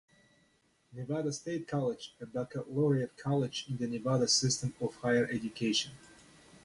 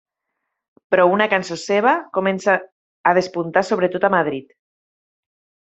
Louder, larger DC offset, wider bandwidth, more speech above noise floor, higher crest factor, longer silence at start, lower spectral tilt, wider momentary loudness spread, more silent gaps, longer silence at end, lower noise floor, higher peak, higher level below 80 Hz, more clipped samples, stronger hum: second, -33 LUFS vs -18 LUFS; neither; first, 11.5 kHz vs 8.2 kHz; second, 38 dB vs 60 dB; about the same, 18 dB vs 20 dB; about the same, 0.9 s vs 0.9 s; about the same, -4.5 dB/octave vs -5 dB/octave; first, 12 LU vs 6 LU; second, none vs 2.72-3.04 s; second, 0.5 s vs 1.2 s; second, -71 dBFS vs -78 dBFS; second, -16 dBFS vs -2 dBFS; about the same, -66 dBFS vs -64 dBFS; neither; neither